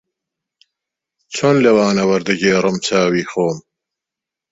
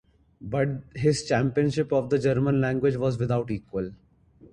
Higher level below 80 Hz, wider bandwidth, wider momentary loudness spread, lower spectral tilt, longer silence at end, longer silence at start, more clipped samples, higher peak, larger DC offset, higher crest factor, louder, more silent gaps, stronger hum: about the same, -56 dBFS vs -52 dBFS; second, 8 kHz vs 11 kHz; about the same, 8 LU vs 9 LU; second, -5 dB/octave vs -7 dB/octave; first, 0.9 s vs 0.6 s; first, 1.3 s vs 0.4 s; neither; first, -2 dBFS vs -10 dBFS; neither; about the same, 16 dB vs 16 dB; first, -15 LUFS vs -26 LUFS; neither; neither